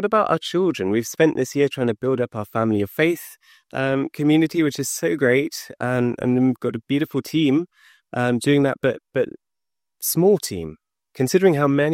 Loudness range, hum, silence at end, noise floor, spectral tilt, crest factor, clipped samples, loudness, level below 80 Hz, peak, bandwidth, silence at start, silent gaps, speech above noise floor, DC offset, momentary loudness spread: 1 LU; none; 0 s; -89 dBFS; -5.5 dB/octave; 16 dB; under 0.1%; -21 LUFS; -62 dBFS; -4 dBFS; 16.5 kHz; 0 s; none; 68 dB; under 0.1%; 9 LU